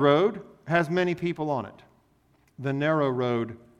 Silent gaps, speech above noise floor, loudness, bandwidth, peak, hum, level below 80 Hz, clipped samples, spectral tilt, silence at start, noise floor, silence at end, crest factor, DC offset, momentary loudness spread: none; 39 dB; -26 LUFS; 12 kHz; -8 dBFS; none; -64 dBFS; under 0.1%; -7.5 dB/octave; 0 s; -64 dBFS; 0.25 s; 18 dB; under 0.1%; 9 LU